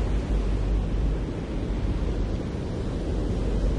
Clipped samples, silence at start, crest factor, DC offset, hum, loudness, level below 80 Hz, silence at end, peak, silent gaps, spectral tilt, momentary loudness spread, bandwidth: under 0.1%; 0 s; 12 dB; under 0.1%; none; -29 LUFS; -28 dBFS; 0 s; -14 dBFS; none; -8 dB/octave; 3 LU; 9 kHz